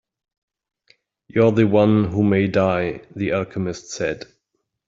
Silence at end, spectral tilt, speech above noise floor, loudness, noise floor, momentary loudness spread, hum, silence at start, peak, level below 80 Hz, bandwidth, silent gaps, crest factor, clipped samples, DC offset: 0.7 s; -7 dB/octave; 56 dB; -20 LUFS; -75 dBFS; 12 LU; none; 1.35 s; -4 dBFS; -54 dBFS; 7.8 kHz; none; 18 dB; under 0.1%; under 0.1%